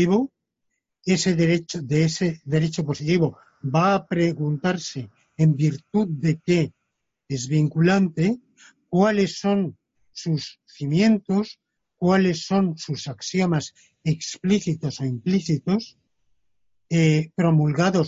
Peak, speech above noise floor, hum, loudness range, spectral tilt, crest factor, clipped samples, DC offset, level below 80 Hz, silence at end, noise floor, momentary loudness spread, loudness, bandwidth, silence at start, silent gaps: -6 dBFS; 57 dB; none; 2 LU; -6.5 dB/octave; 16 dB; under 0.1%; under 0.1%; -58 dBFS; 0 s; -78 dBFS; 11 LU; -23 LUFS; 7.8 kHz; 0 s; none